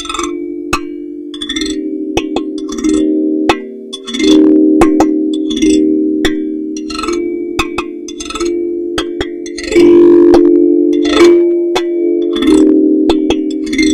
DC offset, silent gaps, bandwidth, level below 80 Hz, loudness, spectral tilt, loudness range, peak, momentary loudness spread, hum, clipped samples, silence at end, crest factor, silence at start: under 0.1%; none; 11.5 kHz; -34 dBFS; -11 LUFS; -4.5 dB/octave; 8 LU; 0 dBFS; 13 LU; none; 0.6%; 0 s; 10 dB; 0 s